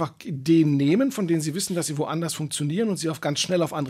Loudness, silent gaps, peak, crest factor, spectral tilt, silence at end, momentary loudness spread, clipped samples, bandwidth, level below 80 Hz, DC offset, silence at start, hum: -24 LUFS; none; -10 dBFS; 14 dB; -5 dB/octave; 0 s; 7 LU; under 0.1%; 16 kHz; -68 dBFS; under 0.1%; 0 s; none